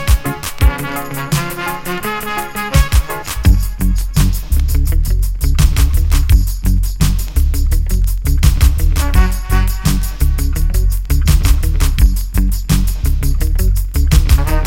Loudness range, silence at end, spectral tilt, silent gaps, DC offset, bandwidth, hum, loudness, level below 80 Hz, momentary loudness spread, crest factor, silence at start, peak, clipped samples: 2 LU; 0 s; -5 dB/octave; none; under 0.1%; 17 kHz; none; -16 LUFS; -14 dBFS; 6 LU; 12 dB; 0 s; 0 dBFS; under 0.1%